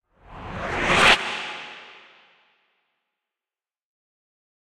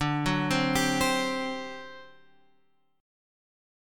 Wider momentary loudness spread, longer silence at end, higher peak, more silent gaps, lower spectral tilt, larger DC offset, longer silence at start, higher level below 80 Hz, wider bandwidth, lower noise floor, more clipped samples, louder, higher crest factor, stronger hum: first, 24 LU vs 16 LU; first, 2.75 s vs 1 s; first, -2 dBFS vs -12 dBFS; neither; second, -2.5 dB/octave vs -4 dB/octave; neither; first, 0.3 s vs 0 s; first, -46 dBFS vs -52 dBFS; about the same, 16 kHz vs 17.5 kHz; first, under -90 dBFS vs -71 dBFS; neither; first, -20 LUFS vs -27 LUFS; about the same, 24 dB vs 20 dB; neither